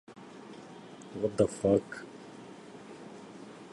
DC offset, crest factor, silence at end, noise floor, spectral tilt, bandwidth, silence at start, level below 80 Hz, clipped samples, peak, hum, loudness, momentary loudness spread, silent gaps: under 0.1%; 24 dB; 0.05 s; -49 dBFS; -6.5 dB/octave; 11.5 kHz; 0.1 s; -62 dBFS; under 0.1%; -10 dBFS; none; -31 LUFS; 21 LU; none